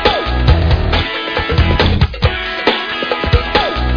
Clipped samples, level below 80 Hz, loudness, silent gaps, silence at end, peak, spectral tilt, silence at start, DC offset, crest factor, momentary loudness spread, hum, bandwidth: under 0.1%; -18 dBFS; -14 LUFS; none; 0 s; 0 dBFS; -7 dB/octave; 0 s; under 0.1%; 14 dB; 4 LU; none; 5.4 kHz